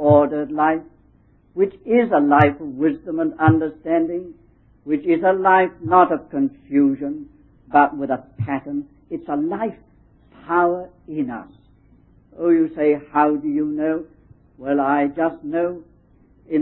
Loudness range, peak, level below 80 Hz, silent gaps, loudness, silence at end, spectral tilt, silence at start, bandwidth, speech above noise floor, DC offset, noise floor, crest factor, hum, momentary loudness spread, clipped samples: 6 LU; 0 dBFS; -52 dBFS; none; -20 LUFS; 0 s; -11 dB/octave; 0 s; 4 kHz; 36 dB; under 0.1%; -55 dBFS; 20 dB; none; 14 LU; under 0.1%